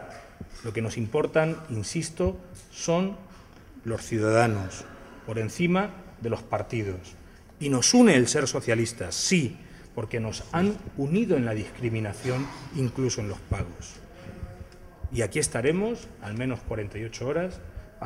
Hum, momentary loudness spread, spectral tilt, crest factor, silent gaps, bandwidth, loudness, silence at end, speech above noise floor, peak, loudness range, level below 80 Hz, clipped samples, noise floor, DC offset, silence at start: none; 20 LU; -5 dB/octave; 22 dB; none; 15.5 kHz; -27 LUFS; 0 s; 22 dB; -6 dBFS; 7 LU; -46 dBFS; under 0.1%; -48 dBFS; under 0.1%; 0 s